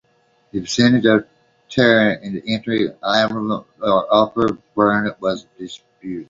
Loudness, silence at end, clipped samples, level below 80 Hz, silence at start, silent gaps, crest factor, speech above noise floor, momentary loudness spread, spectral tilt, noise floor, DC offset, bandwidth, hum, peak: -18 LUFS; 0.05 s; under 0.1%; -54 dBFS; 0.55 s; none; 18 dB; 42 dB; 15 LU; -5.5 dB/octave; -60 dBFS; under 0.1%; 7.8 kHz; none; -2 dBFS